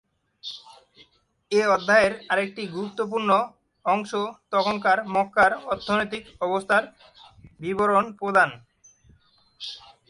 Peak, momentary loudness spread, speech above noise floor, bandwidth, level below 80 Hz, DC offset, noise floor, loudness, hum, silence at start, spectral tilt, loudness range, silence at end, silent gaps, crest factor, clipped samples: -6 dBFS; 17 LU; 36 dB; 11.5 kHz; -62 dBFS; under 0.1%; -60 dBFS; -23 LUFS; none; 0.45 s; -4.5 dB/octave; 2 LU; 0.3 s; none; 20 dB; under 0.1%